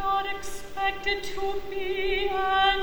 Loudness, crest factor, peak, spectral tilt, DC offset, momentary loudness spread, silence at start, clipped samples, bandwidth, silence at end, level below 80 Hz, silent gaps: -28 LUFS; 14 dB; -12 dBFS; -2.5 dB/octave; under 0.1%; 10 LU; 0 s; under 0.1%; over 20 kHz; 0 s; -42 dBFS; none